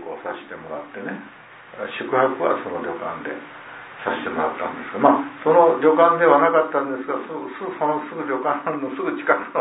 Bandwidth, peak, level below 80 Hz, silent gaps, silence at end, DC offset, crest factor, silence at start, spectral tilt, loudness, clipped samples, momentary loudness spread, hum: 4 kHz; -2 dBFS; -68 dBFS; none; 0 s; under 0.1%; 20 dB; 0 s; -10 dB/octave; -21 LUFS; under 0.1%; 18 LU; none